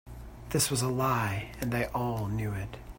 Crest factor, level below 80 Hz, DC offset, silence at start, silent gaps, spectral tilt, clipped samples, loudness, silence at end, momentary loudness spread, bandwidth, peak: 18 dB; -48 dBFS; under 0.1%; 0.05 s; none; -4.5 dB/octave; under 0.1%; -31 LUFS; 0 s; 9 LU; 16.5 kHz; -14 dBFS